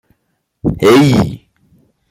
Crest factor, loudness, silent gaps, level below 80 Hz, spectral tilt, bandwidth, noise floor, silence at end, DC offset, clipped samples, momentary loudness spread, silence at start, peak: 12 dB; -11 LUFS; none; -38 dBFS; -6.5 dB/octave; 16 kHz; -66 dBFS; 0.75 s; under 0.1%; under 0.1%; 12 LU; 0.65 s; -2 dBFS